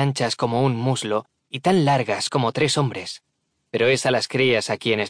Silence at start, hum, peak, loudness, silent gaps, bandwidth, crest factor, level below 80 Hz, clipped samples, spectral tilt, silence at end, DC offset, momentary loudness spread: 0 s; none; -8 dBFS; -21 LUFS; none; 10.5 kHz; 14 dB; -62 dBFS; under 0.1%; -5 dB/octave; 0 s; under 0.1%; 10 LU